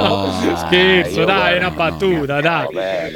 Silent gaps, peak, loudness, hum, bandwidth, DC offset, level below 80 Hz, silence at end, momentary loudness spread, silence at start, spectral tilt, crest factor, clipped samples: none; 0 dBFS; -15 LUFS; none; 17.5 kHz; under 0.1%; -40 dBFS; 0 s; 7 LU; 0 s; -5 dB/octave; 16 dB; under 0.1%